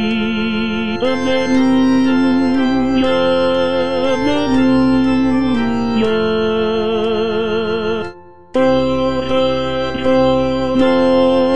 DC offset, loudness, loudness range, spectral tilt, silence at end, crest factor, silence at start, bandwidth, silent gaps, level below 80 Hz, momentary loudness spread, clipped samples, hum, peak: 4%; -15 LUFS; 3 LU; -6.5 dB/octave; 0 s; 12 dB; 0 s; 8.4 kHz; none; -40 dBFS; 5 LU; under 0.1%; none; -2 dBFS